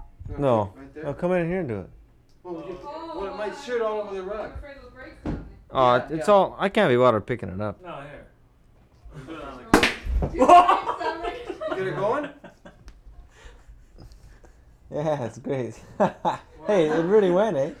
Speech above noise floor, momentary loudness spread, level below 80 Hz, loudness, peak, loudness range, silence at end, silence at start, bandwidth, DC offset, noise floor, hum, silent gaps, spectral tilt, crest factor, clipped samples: 33 dB; 19 LU; -42 dBFS; -23 LUFS; 0 dBFS; 11 LU; 0.05 s; 0 s; 15.5 kHz; under 0.1%; -56 dBFS; none; none; -6 dB/octave; 24 dB; under 0.1%